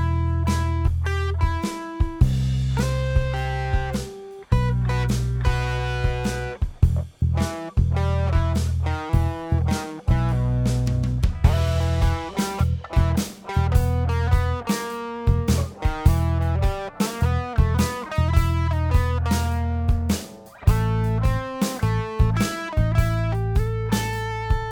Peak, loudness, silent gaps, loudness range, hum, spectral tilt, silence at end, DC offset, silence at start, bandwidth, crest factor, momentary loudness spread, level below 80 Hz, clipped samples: -2 dBFS; -23 LUFS; none; 2 LU; none; -6.5 dB/octave; 0 s; under 0.1%; 0 s; 18 kHz; 18 dB; 5 LU; -26 dBFS; under 0.1%